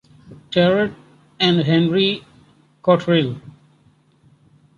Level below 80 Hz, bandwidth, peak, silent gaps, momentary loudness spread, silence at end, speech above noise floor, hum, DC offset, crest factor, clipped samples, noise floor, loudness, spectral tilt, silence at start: -56 dBFS; 7.2 kHz; -2 dBFS; none; 10 LU; 1.3 s; 39 dB; none; under 0.1%; 18 dB; under 0.1%; -56 dBFS; -18 LUFS; -7 dB/octave; 0.3 s